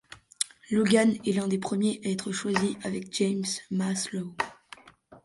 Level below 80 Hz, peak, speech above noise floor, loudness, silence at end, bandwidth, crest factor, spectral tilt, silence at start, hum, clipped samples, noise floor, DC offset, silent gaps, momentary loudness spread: -66 dBFS; -6 dBFS; 27 dB; -28 LUFS; 0.05 s; 11.5 kHz; 22 dB; -4.5 dB/octave; 0.1 s; none; under 0.1%; -54 dBFS; under 0.1%; none; 11 LU